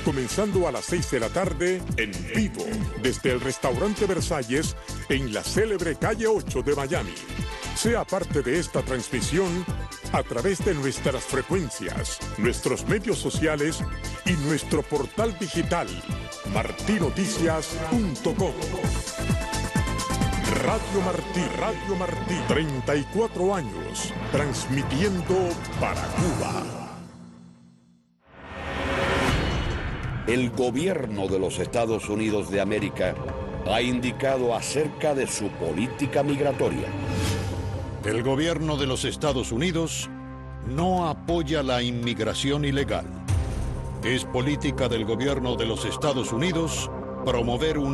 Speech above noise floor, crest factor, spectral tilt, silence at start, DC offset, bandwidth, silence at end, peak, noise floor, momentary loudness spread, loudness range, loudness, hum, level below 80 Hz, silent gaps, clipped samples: 34 dB; 18 dB; -5 dB/octave; 0 s; under 0.1%; 12.5 kHz; 0 s; -8 dBFS; -60 dBFS; 6 LU; 1 LU; -26 LUFS; none; -38 dBFS; none; under 0.1%